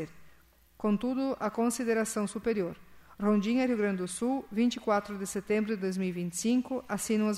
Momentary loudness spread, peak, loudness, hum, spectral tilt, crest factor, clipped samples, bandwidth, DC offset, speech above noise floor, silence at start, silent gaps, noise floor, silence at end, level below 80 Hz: 6 LU; -16 dBFS; -31 LUFS; none; -5 dB/octave; 16 dB; under 0.1%; 15 kHz; under 0.1%; 30 dB; 0 s; none; -60 dBFS; 0 s; -62 dBFS